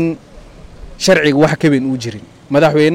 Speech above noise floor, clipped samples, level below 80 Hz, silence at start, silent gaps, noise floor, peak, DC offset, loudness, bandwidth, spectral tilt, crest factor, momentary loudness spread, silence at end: 24 dB; under 0.1%; -42 dBFS; 0 s; none; -36 dBFS; -2 dBFS; under 0.1%; -13 LUFS; 16 kHz; -5.5 dB/octave; 12 dB; 16 LU; 0 s